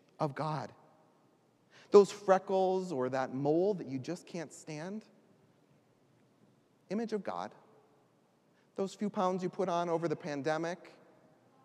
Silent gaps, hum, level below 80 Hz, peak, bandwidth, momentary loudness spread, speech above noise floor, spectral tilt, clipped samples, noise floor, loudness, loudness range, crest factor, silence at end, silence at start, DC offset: none; none; -90 dBFS; -10 dBFS; 11 kHz; 16 LU; 37 dB; -6.5 dB/octave; under 0.1%; -69 dBFS; -33 LUFS; 13 LU; 26 dB; 0.75 s; 0.2 s; under 0.1%